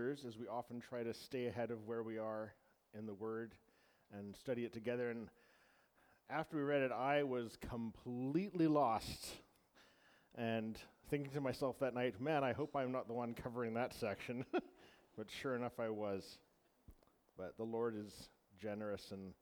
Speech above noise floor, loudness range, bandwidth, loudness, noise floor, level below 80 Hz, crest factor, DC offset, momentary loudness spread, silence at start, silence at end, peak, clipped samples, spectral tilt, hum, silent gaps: 31 dB; 8 LU; over 20 kHz; -43 LUFS; -74 dBFS; -72 dBFS; 20 dB; under 0.1%; 16 LU; 0 s; 0.1 s; -24 dBFS; under 0.1%; -6 dB/octave; none; none